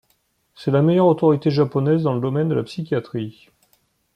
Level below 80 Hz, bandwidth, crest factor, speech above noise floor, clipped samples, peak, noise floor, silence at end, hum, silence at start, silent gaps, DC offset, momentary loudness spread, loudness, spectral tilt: -62 dBFS; 9.8 kHz; 16 dB; 47 dB; under 0.1%; -4 dBFS; -66 dBFS; 0.85 s; none; 0.6 s; none; under 0.1%; 13 LU; -20 LUFS; -9 dB/octave